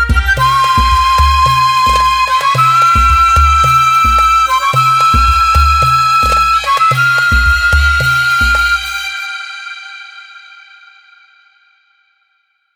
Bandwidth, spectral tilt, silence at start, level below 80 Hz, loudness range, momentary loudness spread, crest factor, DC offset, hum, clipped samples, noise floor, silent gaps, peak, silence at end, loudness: 19.5 kHz; -3 dB/octave; 0 s; -20 dBFS; 9 LU; 10 LU; 10 dB; under 0.1%; none; under 0.1%; -61 dBFS; none; 0 dBFS; 2.4 s; -9 LUFS